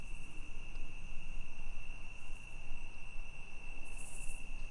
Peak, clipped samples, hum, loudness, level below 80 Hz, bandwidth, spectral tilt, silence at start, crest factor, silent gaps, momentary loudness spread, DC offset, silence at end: -24 dBFS; under 0.1%; none; -50 LUFS; -42 dBFS; 11.5 kHz; -3.5 dB/octave; 0 s; 10 dB; none; 3 LU; under 0.1%; 0 s